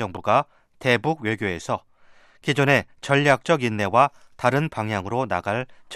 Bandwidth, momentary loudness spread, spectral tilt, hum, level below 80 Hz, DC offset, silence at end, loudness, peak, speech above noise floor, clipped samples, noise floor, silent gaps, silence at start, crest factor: 13.5 kHz; 9 LU; -5.5 dB/octave; none; -60 dBFS; under 0.1%; 0 s; -22 LUFS; -4 dBFS; 30 dB; under 0.1%; -52 dBFS; none; 0 s; 20 dB